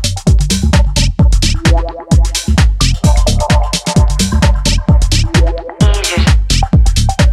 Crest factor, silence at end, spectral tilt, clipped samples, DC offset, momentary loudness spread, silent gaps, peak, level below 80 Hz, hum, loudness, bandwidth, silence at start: 10 dB; 0 s; -4.5 dB/octave; under 0.1%; under 0.1%; 2 LU; none; 0 dBFS; -12 dBFS; none; -12 LUFS; 14 kHz; 0 s